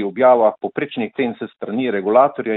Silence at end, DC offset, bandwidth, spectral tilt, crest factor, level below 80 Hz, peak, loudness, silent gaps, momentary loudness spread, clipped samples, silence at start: 0 s; under 0.1%; 4.1 kHz; -10.5 dB/octave; 16 dB; -66 dBFS; -2 dBFS; -18 LUFS; none; 11 LU; under 0.1%; 0 s